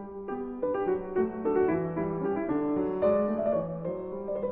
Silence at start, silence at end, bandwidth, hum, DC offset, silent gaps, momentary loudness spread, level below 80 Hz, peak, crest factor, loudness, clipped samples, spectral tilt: 0 s; 0 s; 3.8 kHz; none; under 0.1%; none; 9 LU; -56 dBFS; -14 dBFS; 14 dB; -30 LUFS; under 0.1%; -12 dB/octave